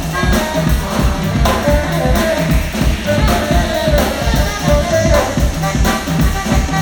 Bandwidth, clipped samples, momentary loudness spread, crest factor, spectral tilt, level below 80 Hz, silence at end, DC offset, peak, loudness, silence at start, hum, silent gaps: over 20 kHz; under 0.1%; 3 LU; 14 dB; -5 dB/octave; -18 dBFS; 0 s; under 0.1%; 0 dBFS; -15 LUFS; 0 s; none; none